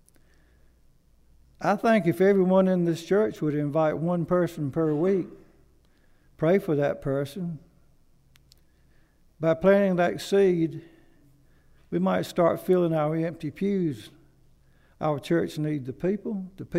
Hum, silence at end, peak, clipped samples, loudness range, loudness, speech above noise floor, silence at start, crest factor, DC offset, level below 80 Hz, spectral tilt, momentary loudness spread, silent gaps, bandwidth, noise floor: none; 0 s; -8 dBFS; under 0.1%; 6 LU; -25 LUFS; 35 dB; 1.6 s; 18 dB; under 0.1%; -58 dBFS; -7.5 dB/octave; 10 LU; none; 15.5 kHz; -59 dBFS